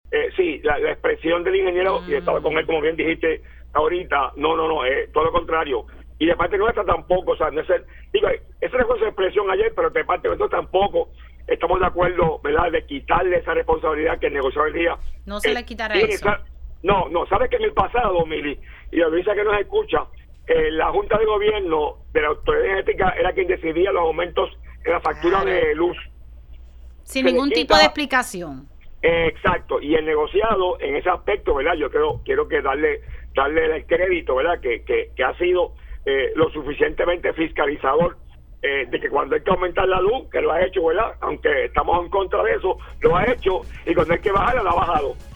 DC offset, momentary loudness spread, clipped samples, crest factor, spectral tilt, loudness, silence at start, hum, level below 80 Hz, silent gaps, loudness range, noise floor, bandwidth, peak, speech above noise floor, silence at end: under 0.1%; 5 LU; under 0.1%; 20 dB; -5.5 dB/octave; -21 LUFS; 0.05 s; none; -36 dBFS; none; 2 LU; -41 dBFS; 19 kHz; 0 dBFS; 21 dB; 0 s